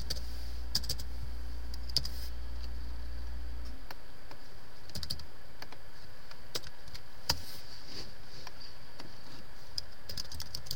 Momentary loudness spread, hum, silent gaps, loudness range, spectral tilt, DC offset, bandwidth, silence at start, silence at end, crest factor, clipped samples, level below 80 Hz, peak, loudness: 18 LU; none; none; 7 LU; -2.5 dB/octave; 3%; 16.5 kHz; 0 s; 0 s; 30 dB; under 0.1%; -46 dBFS; -12 dBFS; -41 LUFS